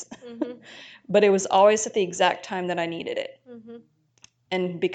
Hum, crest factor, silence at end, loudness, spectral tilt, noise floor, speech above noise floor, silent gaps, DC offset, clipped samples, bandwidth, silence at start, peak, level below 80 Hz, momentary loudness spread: none; 20 dB; 0 s; -23 LUFS; -4 dB/octave; -58 dBFS; 34 dB; none; under 0.1%; under 0.1%; 9.4 kHz; 0 s; -6 dBFS; -72 dBFS; 24 LU